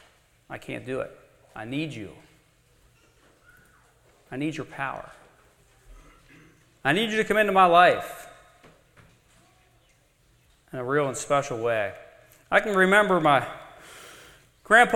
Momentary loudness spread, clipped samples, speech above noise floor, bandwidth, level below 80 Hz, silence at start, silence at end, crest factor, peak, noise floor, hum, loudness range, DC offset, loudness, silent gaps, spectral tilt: 25 LU; under 0.1%; 40 dB; 15.5 kHz; -60 dBFS; 0.5 s; 0 s; 24 dB; -4 dBFS; -63 dBFS; none; 14 LU; under 0.1%; -23 LUFS; none; -4.5 dB/octave